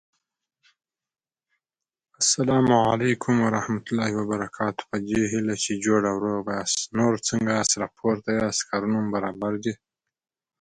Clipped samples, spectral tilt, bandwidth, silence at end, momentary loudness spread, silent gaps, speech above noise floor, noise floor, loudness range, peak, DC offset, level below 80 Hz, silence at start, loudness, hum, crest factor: under 0.1%; -4 dB/octave; 9.6 kHz; 0.9 s; 8 LU; none; 63 dB; -87 dBFS; 2 LU; -6 dBFS; under 0.1%; -58 dBFS; 2.2 s; -24 LUFS; none; 20 dB